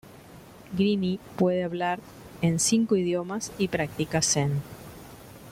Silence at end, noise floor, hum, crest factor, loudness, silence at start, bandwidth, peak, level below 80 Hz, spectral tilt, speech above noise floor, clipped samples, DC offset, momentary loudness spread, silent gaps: 0 s; -48 dBFS; none; 18 dB; -26 LUFS; 0.05 s; 16.5 kHz; -8 dBFS; -56 dBFS; -4.5 dB/octave; 22 dB; under 0.1%; under 0.1%; 21 LU; none